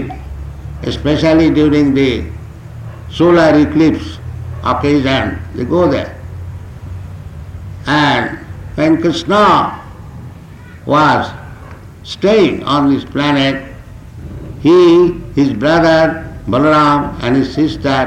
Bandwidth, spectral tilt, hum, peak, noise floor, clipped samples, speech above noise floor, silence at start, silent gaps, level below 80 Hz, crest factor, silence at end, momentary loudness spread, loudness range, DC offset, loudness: 10 kHz; -6.5 dB/octave; none; -2 dBFS; -33 dBFS; under 0.1%; 22 dB; 0 s; none; -34 dBFS; 10 dB; 0 s; 21 LU; 6 LU; under 0.1%; -12 LUFS